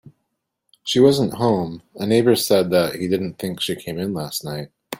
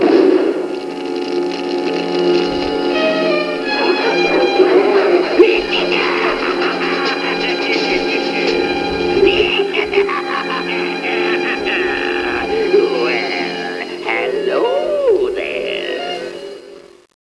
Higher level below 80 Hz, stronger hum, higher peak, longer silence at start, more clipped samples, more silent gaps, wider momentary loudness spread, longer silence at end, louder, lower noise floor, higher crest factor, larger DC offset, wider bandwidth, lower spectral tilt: second, -58 dBFS vs -46 dBFS; neither; about the same, -2 dBFS vs 0 dBFS; about the same, 0.05 s vs 0 s; neither; neither; first, 13 LU vs 9 LU; second, 0.05 s vs 0.4 s; second, -20 LUFS vs -16 LUFS; first, -76 dBFS vs -37 dBFS; about the same, 18 dB vs 16 dB; neither; first, 16.5 kHz vs 11 kHz; about the same, -5 dB/octave vs -4.5 dB/octave